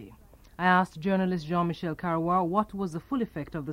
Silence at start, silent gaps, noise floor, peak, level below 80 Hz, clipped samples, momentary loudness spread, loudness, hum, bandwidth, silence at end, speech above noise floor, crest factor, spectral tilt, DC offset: 0 s; none; -53 dBFS; -8 dBFS; -56 dBFS; under 0.1%; 9 LU; -28 LUFS; none; 12 kHz; 0 s; 25 dB; 20 dB; -7.5 dB/octave; under 0.1%